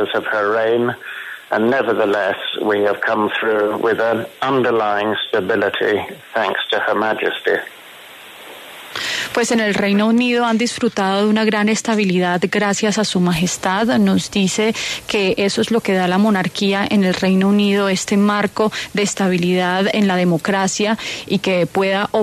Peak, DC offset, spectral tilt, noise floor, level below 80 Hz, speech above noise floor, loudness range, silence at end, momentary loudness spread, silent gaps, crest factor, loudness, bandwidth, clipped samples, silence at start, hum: -4 dBFS; under 0.1%; -4.5 dB/octave; -39 dBFS; -54 dBFS; 22 dB; 3 LU; 0 s; 6 LU; none; 14 dB; -17 LUFS; 13.5 kHz; under 0.1%; 0 s; none